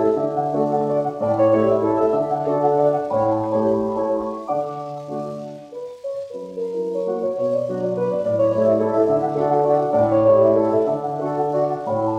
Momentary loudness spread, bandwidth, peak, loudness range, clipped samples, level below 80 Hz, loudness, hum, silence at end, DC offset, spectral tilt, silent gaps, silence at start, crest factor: 13 LU; 7.8 kHz; -6 dBFS; 8 LU; under 0.1%; -58 dBFS; -20 LUFS; none; 0 s; under 0.1%; -9 dB/octave; none; 0 s; 14 dB